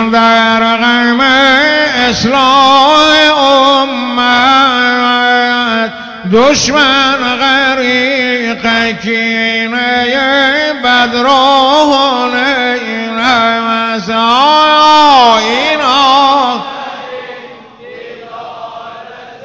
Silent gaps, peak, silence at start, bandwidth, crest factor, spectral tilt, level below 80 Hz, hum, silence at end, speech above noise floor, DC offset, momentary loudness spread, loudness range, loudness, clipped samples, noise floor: none; 0 dBFS; 0 s; 8 kHz; 10 dB; -3 dB/octave; -44 dBFS; none; 0 s; 23 dB; under 0.1%; 17 LU; 4 LU; -8 LUFS; under 0.1%; -31 dBFS